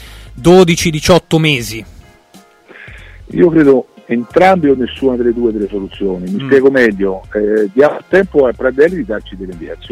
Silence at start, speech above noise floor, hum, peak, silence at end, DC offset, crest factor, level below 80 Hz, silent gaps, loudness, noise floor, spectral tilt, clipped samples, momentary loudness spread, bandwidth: 0 s; 32 dB; none; 0 dBFS; 0.05 s; under 0.1%; 12 dB; -36 dBFS; none; -12 LUFS; -44 dBFS; -5.5 dB/octave; under 0.1%; 13 LU; 15.5 kHz